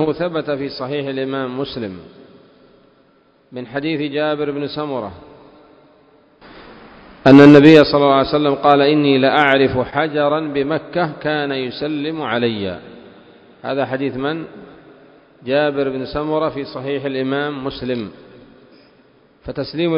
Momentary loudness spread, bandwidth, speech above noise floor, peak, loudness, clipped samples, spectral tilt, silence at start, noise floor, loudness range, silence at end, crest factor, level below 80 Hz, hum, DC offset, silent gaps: 17 LU; 8 kHz; 39 dB; 0 dBFS; -16 LUFS; 0.4%; -7.5 dB/octave; 0 s; -54 dBFS; 14 LU; 0 s; 18 dB; -48 dBFS; none; under 0.1%; none